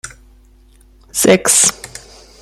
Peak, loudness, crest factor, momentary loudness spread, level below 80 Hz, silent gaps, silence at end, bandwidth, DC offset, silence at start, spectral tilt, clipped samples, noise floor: 0 dBFS; -11 LUFS; 18 dB; 24 LU; -46 dBFS; none; 0.55 s; 16 kHz; under 0.1%; 0.05 s; -2 dB/octave; under 0.1%; -46 dBFS